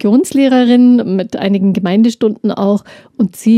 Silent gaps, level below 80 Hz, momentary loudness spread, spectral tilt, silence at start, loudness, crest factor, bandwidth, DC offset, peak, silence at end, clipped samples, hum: none; -58 dBFS; 9 LU; -6.5 dB/octave; 0.05 s; -12 LUFS; 10 dB; 13.5 kHz; under 0.1%; -2 dBFS; 0 s; under 0.1%; none